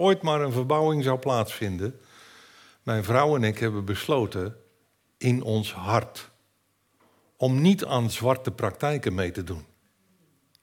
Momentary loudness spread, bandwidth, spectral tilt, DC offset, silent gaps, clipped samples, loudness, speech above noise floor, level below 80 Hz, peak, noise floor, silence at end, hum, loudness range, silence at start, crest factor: 12 LU; 17.5 kHz; -6.5 dB/octave; under 0.1%; none; under 0.1%; -26 LUFS; 45 dB; -62 dBFS; -6 dBFS; -70 dBFS; 1 s; none; 3 LU; 0 s; 20 dB